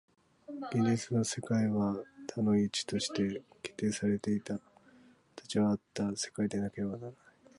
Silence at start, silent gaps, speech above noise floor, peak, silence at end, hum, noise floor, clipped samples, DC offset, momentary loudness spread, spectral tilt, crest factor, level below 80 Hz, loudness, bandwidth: 0.5 s; none; 29 dB; -18 dBFS; 0.45 s; none; -62 dBFS; under 0.1%; under 0.1%; 12 LU; -5.5 dB/octave; 16 dB; -66 dBFS; -34 LUFS; 11.5 kHz